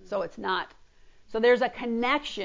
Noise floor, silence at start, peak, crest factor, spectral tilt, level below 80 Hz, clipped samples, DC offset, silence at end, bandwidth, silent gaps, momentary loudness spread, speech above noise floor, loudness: -54 dBFS; 0.05 s; -10 dBFS; 18 dB; -4.5 dB/octave; -58 dBFS; under 0.1%; under 0.1%; 0 s; 7.6 kHz; none; 11 LU; 27 dB; -27 LUFS